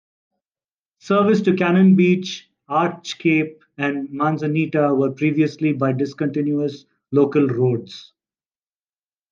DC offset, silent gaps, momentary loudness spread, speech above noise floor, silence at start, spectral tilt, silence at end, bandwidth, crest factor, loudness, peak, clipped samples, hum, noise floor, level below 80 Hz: under 0.1%; none; 10 LU; over 72 dB; 1.05 s; -7.5 dB/octave; 1.3 s; 7.2 kHz; 16 dB; -19 LUFS; -4 dBFS; under 0.1%; none; under -90 dBFS; -70 dBFS